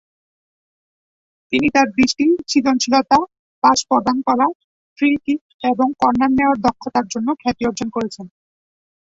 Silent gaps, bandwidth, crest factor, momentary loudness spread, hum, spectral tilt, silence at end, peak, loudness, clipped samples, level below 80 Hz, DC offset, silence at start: 3.39-3.62 s, 4.55-4.96 s, 5.41-5.59 s; 7.8 kHz; 16 dB; 8 LU; none; -3.5 dB/octave; 0.75 s; -2 dBFS; -17 LUFS; under 0.1%; -52 dBFS; under 0.1%; 1.5 s